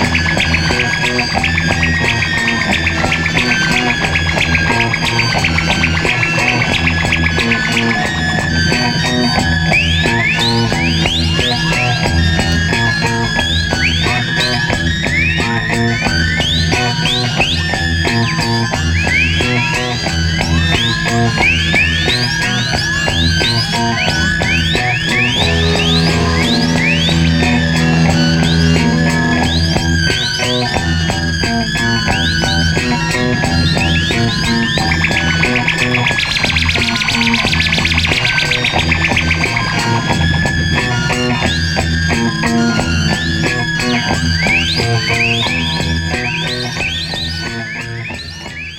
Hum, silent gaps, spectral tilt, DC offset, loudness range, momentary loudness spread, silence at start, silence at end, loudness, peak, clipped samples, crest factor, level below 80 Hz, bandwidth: none; none; -4 dB/octave; under 0.1%; 2 LU; 3 LU; 0 s; 0 s; -13 LUFS; 0 dBFS; under 0.1%; 14 dB; -26 dBFS; 15.5 kHz